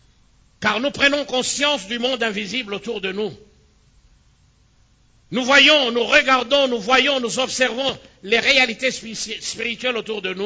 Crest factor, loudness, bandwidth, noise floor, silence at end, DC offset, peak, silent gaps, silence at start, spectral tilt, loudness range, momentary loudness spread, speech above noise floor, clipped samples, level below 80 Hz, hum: 20 dB; -18 LUFS; 8 kHz; -57 dBFS; 0 s; under 0.1%; 0 dBFS; none; 0.6 s; -2 dB/octave; 10 LU; 12 LU; 37 dB; under 0.1%; -54 dBFS; none